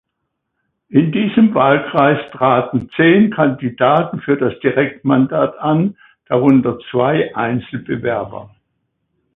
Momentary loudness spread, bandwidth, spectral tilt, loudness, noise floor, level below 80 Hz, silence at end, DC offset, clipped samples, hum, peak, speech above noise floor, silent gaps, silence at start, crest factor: 9 LU; 4 kHz; -10 dB/octave; -15 LUFS; -74 dBFS; -54 dBFS; 0.9 s; under 0.1%; under 0.1%; none; 0 dBFS; 60 dB; none; 0.9 s; 16 dB